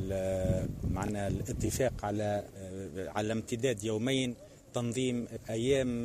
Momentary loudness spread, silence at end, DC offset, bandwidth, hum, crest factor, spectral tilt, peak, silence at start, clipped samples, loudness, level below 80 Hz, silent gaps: 8 LU; 0 s; under 0.1%; 15 kHz; none; 16 dB; -5.5 dB/octave; -16 dBFS; 0 s; under 0.1%; -34 LUFS; -48 dBFS; none